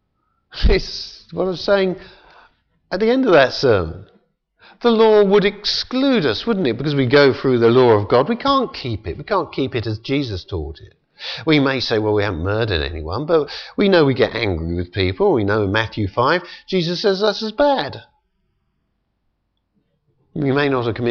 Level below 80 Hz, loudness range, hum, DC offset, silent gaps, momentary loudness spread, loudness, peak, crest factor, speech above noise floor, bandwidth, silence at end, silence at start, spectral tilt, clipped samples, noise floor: -34 dBFS; 7 LU; none; under 0.1%; none; 13 LU; -18 LUFS; -2 dBFS; 16 dB; 52 dB; 6.8 kHz; 0 s; 0.55 s; -6.5 dB/octave; under 0.1%; -70 dBFS